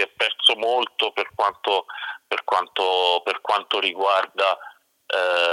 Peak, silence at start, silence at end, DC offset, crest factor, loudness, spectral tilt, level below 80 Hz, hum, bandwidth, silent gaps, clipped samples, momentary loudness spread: -2 dBFS; 0 s; 0 s; under 0.1%; 20 dB; -21 LUFS; -0.5 dB/octave; -76 dBFS; none; 15.5 kHz; none; under 0.1%; 9 LU